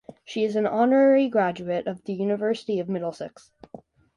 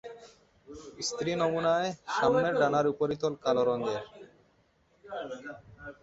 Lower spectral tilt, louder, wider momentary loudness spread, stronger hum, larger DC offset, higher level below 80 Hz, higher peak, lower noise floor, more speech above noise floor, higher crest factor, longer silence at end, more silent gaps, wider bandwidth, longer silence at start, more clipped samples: first, -7 dB/octave vs -4.5 dB/octave; first, -24 LUFS vs -29 LUFS; second, 14 LU vs 22 LU; neither; neither; about the same, -68 dBFS vs -66 dBFS; first, -8 dBFS vs -12 dBFS; second, -47 dBFS vs -68 dBFS; second, 24 dB vs 39 dB; about the same, 16 dB vs 20 dB; first, 0.4 s vs 0.1 s; neither; first, 10.5 kHz vs 8 kHz; first, 0.3 s vs 0.05 s; neither